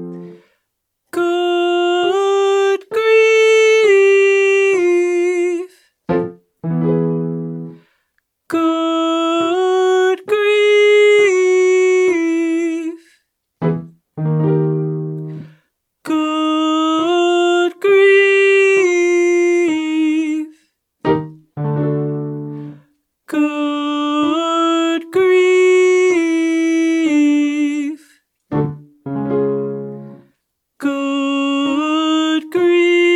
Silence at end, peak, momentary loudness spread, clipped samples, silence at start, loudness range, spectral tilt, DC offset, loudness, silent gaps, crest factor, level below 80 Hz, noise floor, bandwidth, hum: 0 s; -2 dBFS; 15 LU; under 0.1%; 0 s; 8 LU; -5.5 dB/octave; under 0.1%; -15 LUFS; none; 12 dB; -60 dBFS; -73 dBFS; 11 kHz; none